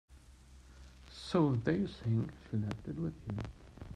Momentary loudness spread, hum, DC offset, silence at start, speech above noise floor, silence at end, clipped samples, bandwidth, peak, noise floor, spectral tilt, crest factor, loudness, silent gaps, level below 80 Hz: 22 LU; none; under 0.1%; 0.1 s; 23 dB; 0 s; under 0.1%; 10 kHz; -18 dBFS; -58 dBFS; -8 dB/octave; 18 dB; -36 LUFS; none; -56 dBFS